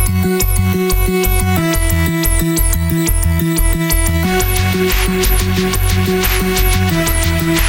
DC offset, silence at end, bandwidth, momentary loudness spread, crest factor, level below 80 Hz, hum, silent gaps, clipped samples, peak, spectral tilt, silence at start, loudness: under 0.1%; 0 s; 17.5 kHz; 1 LU; 12 dB; -18 dBFS; none; none; under 0.1%; -2 dBFS; -4.5 dB/octave; 0 s; -14 LUFS